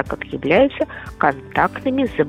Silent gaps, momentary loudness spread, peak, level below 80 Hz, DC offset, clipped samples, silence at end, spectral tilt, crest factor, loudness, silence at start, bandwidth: none; 10 LU; -2 dBFS; -42 dBFS; under 0.1%; under 0.1%; 0 s; -7 dB/octave; 18 dB; -19 LUFS; 0 s; 13 kHz